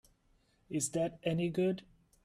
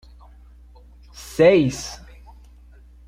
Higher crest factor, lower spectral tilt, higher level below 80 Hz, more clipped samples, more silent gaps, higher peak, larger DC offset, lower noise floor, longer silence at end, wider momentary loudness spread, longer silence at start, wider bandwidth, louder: about the same, 18 dB vs 20 dB; about the same, -5.5 dB/octave vs -5.5 dB/octave; second, -68 dBFS vs -46 dBFS; neither; neither; second, -20 dBFS vs -4 dBFS; neither; first, -72 dBFS vs -47 dBFS; second, 0.45 s vs 1.1 s; second, 7 LU vs 26 LU; second, 0.7 s vs 1.2 s; second, 14 kHz vs 15.5 kHz; second, -35 LUFS vs -18 LUFS